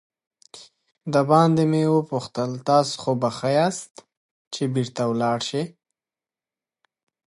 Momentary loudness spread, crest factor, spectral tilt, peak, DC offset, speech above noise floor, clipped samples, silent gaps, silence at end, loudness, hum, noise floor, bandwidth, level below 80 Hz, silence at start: 14 LU; 20 dB; -6 dB/octave; -4 dBFS; under 0.1%; over 69 dB; under 0.1%; 3.91-3.95 s, 4.17-4.51 s; 1.65 s; -22 LUFS; none; under -90 dBFS; 11.5 kHz; -68 dBFS; 0.55 s